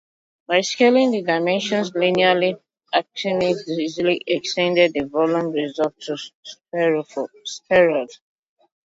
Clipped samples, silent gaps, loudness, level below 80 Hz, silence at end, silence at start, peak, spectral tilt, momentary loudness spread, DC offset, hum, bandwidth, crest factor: under 0.1%; 6.35-6.43 s; -20 LUFS; -64 dBFS; 0.85 s; 0.5 s; -2 dBFS; -4.5 dB/octave; 13 LU; under 0.1%; none; 7.8 kHz; 18 dB